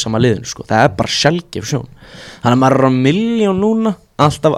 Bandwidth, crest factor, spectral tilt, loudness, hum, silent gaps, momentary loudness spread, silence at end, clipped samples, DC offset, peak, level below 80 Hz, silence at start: 14 kHz; 14 dB; -5.5 dB/octave; -14 LUFS; none; none; 10 LU; 0 s; under 0.1%; under 0.1%; 0 dBFS; -44 dBFS; 0 s